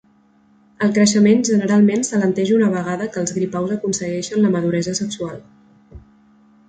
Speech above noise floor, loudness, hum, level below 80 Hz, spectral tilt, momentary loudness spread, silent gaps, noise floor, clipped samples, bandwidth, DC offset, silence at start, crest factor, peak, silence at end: 38 dB; -18 LUFS; none; -54 dBFS; -5 dB/octave; 9 LU; none; -55 dBFS; under 0.1%; 9.4 kHz; under 0.1%; 0.8 s; 16 dB; -2 dBFS; 0.7 s